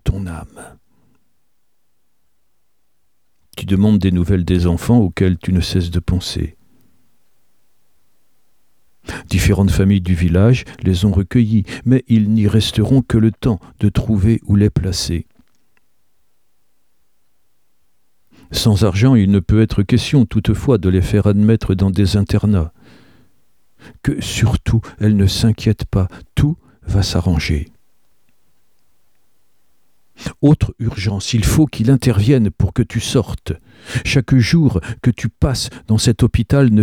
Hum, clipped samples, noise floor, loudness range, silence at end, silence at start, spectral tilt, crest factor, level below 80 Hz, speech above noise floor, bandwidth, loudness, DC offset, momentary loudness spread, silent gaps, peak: none; under 0.1%; -70 dBFS; 8 LU; 0 s; 0.05 s; -6.5 dB/octave; 16 dB; -30 dBFS; 56 dB; 16 kHz; -16 LUFS; 0.2%; 9 LU; none; -2 dBFS